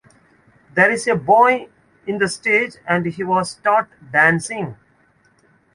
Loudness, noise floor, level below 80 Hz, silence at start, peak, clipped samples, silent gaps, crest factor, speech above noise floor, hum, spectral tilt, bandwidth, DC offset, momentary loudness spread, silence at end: -17 LUFS; -58 dBFS; -60 dBFS; 0.75 s; -2 dBFS; under 0.1%; none; 18 dB; 40 dB; none; -5 dB/octave; 11.5 kHz; under 0.1%; 13 LU; 1 s